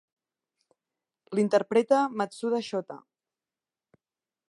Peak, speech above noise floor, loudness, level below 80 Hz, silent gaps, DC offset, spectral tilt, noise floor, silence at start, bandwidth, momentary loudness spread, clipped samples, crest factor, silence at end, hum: -10 dBFS; over 64 dB; -27 LUFS; -84 dBFS; none; under 0.1%; -5.5 dB/octave; under -90 dBFS; 1.3 s; 11.5 kHz; 12 LU; under 0.1%; 20 dB; 1.55 s; none